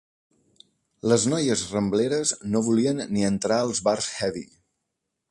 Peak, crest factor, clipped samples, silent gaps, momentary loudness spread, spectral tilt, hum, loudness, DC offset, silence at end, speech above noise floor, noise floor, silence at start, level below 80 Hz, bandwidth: -6 dBFS; 20 dB; under 0.1%; none; 6 LU; -4.5 dB/octave; none; -24 LUFS; under 0.1%; 0.85 s; 57 dB; -81 dBFS; 1.05 s; -58 dBFS; 11.5 kHz